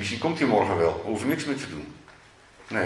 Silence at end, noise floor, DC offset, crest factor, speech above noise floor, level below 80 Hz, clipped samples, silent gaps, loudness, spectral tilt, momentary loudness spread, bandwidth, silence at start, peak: 0 s; -53 dBFS; under 0.1%; 18 dB; 27 dB; -58 dBFS; under 0.1%; none; -26 LUFS; -5.5 dB/octave; 15 LU; 12 kHz; 0 s; -8 dBFS